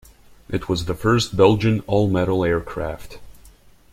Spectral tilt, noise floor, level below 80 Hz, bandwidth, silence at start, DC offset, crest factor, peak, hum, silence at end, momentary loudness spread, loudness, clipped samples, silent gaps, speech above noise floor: -6.5 dB/octave; -49 dBFS; -42 dBFS; 15.5 kHz; 0.5 s; under 0.1%; 18 dB; -2 dBFS; none; 0.45 s; 13 LU; -20 LUFS; under 0.1%; none; 29 dB